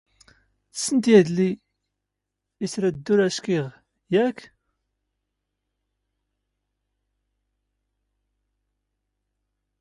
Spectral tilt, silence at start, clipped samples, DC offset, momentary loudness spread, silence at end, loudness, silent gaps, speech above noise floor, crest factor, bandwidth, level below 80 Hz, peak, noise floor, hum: -5.5 dB/octave; 0.75 s; under 0.1%; under 0.1%; 19 LU; 5.35 s; -22 LUFS; none; 62 dB; 24 dB; 11.5 kHz; -66 dBFS; -4 dBFS; -83 dBFS; 50 Hz at -50 dBFS